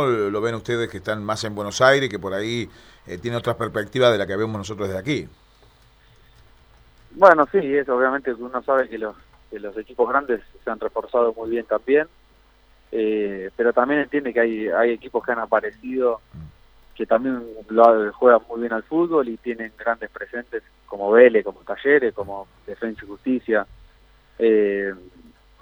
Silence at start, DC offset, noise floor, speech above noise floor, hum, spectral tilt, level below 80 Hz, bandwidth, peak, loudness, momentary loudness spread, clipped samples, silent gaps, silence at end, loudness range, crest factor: 0 s; under 0.1%; -55 dBFS; 34 dB; none; -5.5 dB/octave; -54 dBFS; 19.5 kHz; 0 dBFS; -21 LUFS; 16 LU; under 0.1%; none; 0.55 s; 4 LU; 22 dB